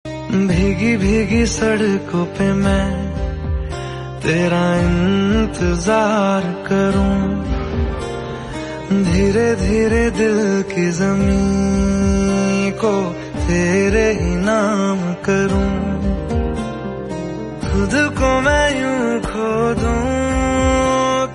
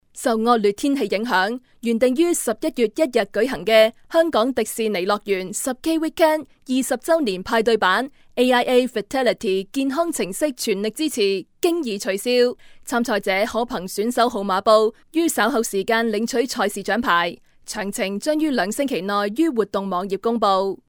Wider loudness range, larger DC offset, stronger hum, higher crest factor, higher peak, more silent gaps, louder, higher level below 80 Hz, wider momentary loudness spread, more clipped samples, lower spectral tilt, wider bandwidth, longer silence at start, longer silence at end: about the same, 3 LU vs 2 LU; neither; neither; about the same, 14 dB vs 18 dB; about the same, -2 dBFS vs -4 dBFS; neither; first, -17 LUFS vs -21 LUFS; first, -26 dBFS vs -54 dBFS; about the same, 9 LU vs 7 LU; neither; first, -6 dB/octave vs -3.5 dB/octave; second, 11.5 kHz vs over 20 kHz; about the same, 0.05 s vs 0.15 s; second, 0 s vs 0.15 s